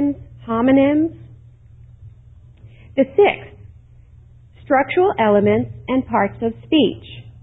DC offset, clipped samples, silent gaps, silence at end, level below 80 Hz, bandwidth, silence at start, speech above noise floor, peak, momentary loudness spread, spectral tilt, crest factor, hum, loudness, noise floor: under 0.1%; under 0.1%; none; 0.1 s; -46 dBFS; 4 kHz; 0 s; 29 dB; -4 dBFS; 11 LU; -10 dB/octave; 16 dB; none; -18 LUFS; -45 dBFS